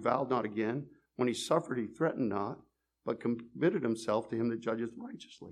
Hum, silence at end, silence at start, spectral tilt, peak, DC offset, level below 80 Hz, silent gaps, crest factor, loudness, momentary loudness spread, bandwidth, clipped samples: none; 0 s; 0 s; -6 dB/octave; -14 dBFS; under 0.1%; -76 dBFS; none; 20 dB; -34 LUFS; 14 LU; 13 kHz; under 0.1%